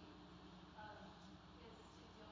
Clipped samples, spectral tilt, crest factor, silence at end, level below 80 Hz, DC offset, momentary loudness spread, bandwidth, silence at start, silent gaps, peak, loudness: under 0.1%; -5.5 dB/octave; 14 dB; 0 s; -70 dBFS; under 0.1%; 4 LU; 8 kHz; 0 s; none; -44 dBFS; -60 LUFS